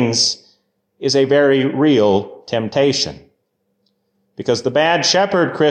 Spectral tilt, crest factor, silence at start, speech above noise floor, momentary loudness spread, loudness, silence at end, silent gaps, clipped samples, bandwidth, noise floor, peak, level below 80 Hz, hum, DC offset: -4 dB/octave; 14 dB; 0 s; 53 dB; 10 LU; -16 LUFS; 0 s; none; under 0.1%; 9.4 kHz; -68 dBFS; -4 dBFS; -54 dBFS; none; under 0.1%